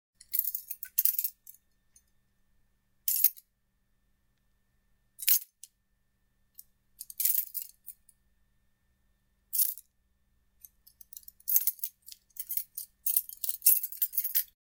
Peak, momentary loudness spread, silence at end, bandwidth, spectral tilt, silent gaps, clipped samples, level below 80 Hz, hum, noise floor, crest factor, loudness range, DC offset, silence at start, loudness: -4 dBFS; 20 LU; 0.35 s; 19 kHz; 4.5 dB/octave; none; under 0.1%; -76 dBFS; none; -75 dBFS; 30 dB; 7 LU; under 0.1%; 0.3 s; -28 LUFS